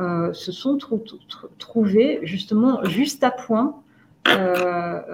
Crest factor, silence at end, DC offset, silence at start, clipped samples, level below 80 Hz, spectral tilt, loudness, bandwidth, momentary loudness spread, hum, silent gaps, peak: 20 dB; 0 s; under 0.1%; 0 s; under 0.1%; -64 dBFS; -5.5 dB/octave; -21 LUFS; 17 kHz; 11 LU; none; none; 0 dBFS